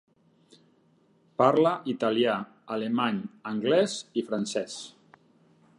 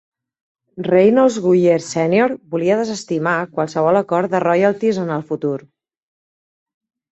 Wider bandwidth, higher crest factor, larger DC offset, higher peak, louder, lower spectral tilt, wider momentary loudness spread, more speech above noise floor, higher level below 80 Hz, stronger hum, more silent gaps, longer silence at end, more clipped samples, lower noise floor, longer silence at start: first, 11.5 kHz vs 8.2 kHz; first, 22 dB vs 16 dB; neither; second, -6 dBFS vs -2 dBFS; second, -27 LUFS vs -17 LUFS; second, -5 dB/octave vs -6.5 dB/octave; first, 13 LU vs 9 LU; second, 38 dB vs over 74 dB; second, -78 dBFS vs -62 dBFS; neither; neither; second, 0.9 s vs 1.5 s; neither; second, -64 dBFS vs under -90 dBFS; first, 1.4 s vs 0.75 s